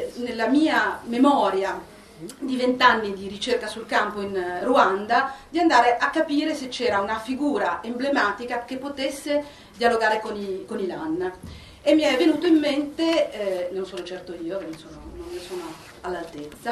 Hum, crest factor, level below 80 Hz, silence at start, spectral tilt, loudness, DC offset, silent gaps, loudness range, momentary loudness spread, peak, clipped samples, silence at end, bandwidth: none; 20 dB; -54 dBFS; 0 s; -4 dB/octave; -23 LUFS; under 0.1%; none; 5 LU; 16 LU; -2 dBFS; under 0.1%; 0 s; 13.5 kHz